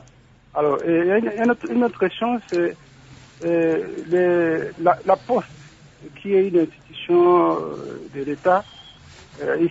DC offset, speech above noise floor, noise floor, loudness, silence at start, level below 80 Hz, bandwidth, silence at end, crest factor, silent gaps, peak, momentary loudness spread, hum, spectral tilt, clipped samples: under 0.1%; 31 dB; -51 dBFS; -21 LUFS; 0.55 s; -58 dBFS; 7.8 kHz; 0 s; 18 dB; none; -2 dBFS; 12 LU; none; -7 dB/octave; under 0.1%